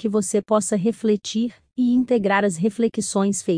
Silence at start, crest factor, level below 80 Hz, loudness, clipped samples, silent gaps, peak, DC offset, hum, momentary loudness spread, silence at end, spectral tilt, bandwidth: 0 s; 16 dB; -62 dBFS; -21 LUFS; under 0.1%; none; -6 dBFS; under 0.1%; none; 5 LU; 0 s; -5 dB/octave; 10.5 kHz